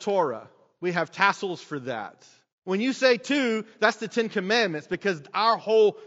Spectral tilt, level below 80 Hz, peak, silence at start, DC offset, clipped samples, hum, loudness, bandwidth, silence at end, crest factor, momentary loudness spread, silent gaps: -2.5 dB/octave; -76 dBFS; -4 dBFS; 0 s; under 0.1%; under 0.1%; none; -25 LUFS; 8 kHz; 0 s; 22 dB; 12 LU; 2.52-2.62 s